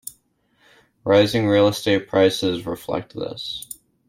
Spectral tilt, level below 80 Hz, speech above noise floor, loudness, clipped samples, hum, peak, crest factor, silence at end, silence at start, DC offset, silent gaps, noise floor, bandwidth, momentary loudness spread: -5 dB/octave; -56 dBFS; 44 dB; -20 LUFS; under 0.1%; none; -4 dBFS; 18 dB; 0.35 s; 0.05 s; under 0.1%; none; -63 dBFS; 16.5 kHz; 15 LU